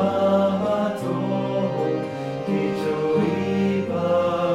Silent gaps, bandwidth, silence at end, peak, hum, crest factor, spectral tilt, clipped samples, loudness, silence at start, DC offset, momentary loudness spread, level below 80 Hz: none; 12.5 kHz; 0 s; -8 dBFS; none; 14 dB; -7.5 dB/octave; under 0.1%; -23 LUFS; 0 s; under 0.1%; 6 LU; -60 dBFS